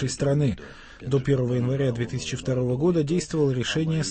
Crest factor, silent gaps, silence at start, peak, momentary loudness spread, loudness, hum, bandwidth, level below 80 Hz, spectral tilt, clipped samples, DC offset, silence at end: 14 dB; none; 0 s; -10 dBFS; 6 LU; -25 LUFS; none; 8.8 kHz; -48 dBFS; -6 dB/octave; under 0.1%; under 0.1%; 0 s